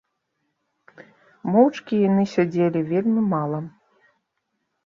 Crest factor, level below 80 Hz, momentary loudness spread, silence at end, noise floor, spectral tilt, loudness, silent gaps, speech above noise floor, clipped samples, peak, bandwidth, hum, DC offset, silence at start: 18 dB; -68 dBFS; 12 LU; 1.15 s; -76 dBFS; -8.5 dB/octave; -21 LUFS; none; 56 dB; under 0.1%; -4 dBFS; 7.2 kHz; none; under 0.1%; 1 s